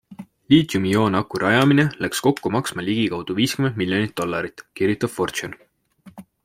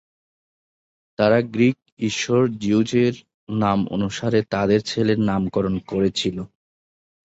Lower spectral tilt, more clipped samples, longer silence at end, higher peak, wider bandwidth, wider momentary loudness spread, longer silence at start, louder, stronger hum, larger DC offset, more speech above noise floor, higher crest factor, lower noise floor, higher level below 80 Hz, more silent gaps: about the same, -5.5 dB/octave vs -6 dB/octave; neither; second, 0.25 s vs 0.9 s; about the same, -2 dBFS vs -4 dBFS; first, 16.5 kHz vs 8 kHz; about the same, 8 LU vs 8 LU; second, 0.1 s vs 1.2 s; about the same, -21 LUFS vs -21 LUFS; neither; neither; second, 30 dB vs over 70 dB; about the same, 18 dB vs 18 dB; second, -50 dBFS vs under -90 dBFS; second, -56 dBFS vs -50 dBFS; second, none vs 1.92-1.97 s, 3.34-3.47 s